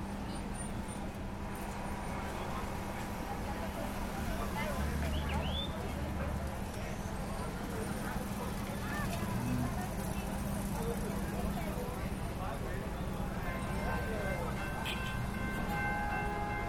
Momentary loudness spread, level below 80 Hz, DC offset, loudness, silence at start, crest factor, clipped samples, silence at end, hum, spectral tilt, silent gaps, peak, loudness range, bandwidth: 5 LU; -42 dBFS; under 0.1%; -38 LUFS; 0 s; 16 dB; under 0.1%; 0 s; none; -5.5 dB/octave; none; -22 dBFS; 3 LU; 16.5 kHz